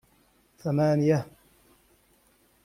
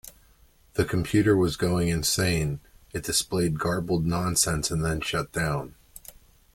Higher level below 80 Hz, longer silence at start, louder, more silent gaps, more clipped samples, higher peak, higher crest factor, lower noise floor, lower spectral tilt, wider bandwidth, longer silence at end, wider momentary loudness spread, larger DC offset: second, -64 dBFS vs -44 dBFS; first, 0.65 s vs 0.05 s; about the same, -26 LUFS vs -25 LUFS; neither; neither; about the same, -10 dBFS vs -10 dBFS; about the same, 18 dB vs 18 dB; first, -64 dBFS vs -58 dBFS; first, -8 dB/octave vs -4.5 dB/octave; second, 14.5 kHz vs 17 kHz; first, 1.4 s vs 0.45 s; about the same, 15 LU vs 13 LU; neither